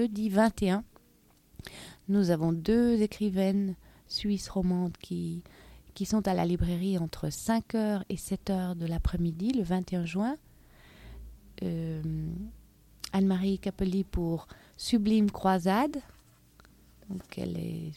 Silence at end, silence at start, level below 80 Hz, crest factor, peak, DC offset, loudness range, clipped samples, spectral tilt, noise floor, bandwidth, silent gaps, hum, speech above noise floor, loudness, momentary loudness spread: 0 s; 0 s; -46 dBFS; 20 dB; -10 dBFS; under 0.1%; 5 LU; under 0.1%; -6.5 dB/octave; -63 dBFS; 16 kHz; none; none; 34 dB; -30 LUFS; 16 LU